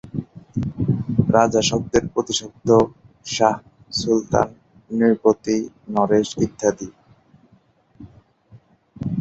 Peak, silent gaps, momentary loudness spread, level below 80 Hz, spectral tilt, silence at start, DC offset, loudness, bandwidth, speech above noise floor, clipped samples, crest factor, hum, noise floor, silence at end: -2 dBFS; none; 14 LU; -48 dBFS; -5.5 dB/octave; 0.05 s; under 0.1%; -20 LUFS; 8.2 kHz; 38 dB; under 0.1%; 20 dB; none; -57 dBFS; 0 s